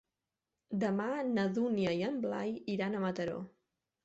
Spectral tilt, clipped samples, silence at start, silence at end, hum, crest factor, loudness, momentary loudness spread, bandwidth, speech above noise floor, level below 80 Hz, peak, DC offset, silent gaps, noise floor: -5.5 dB/octave; under 0.1%; 0.7 s; 0.55 s; none; 14 dB; -35 LUFS; 7 LU; 8 kHz; 55 dB; -74 dBFS; -22 dBFS; under 0.1%; none; -89 dBFS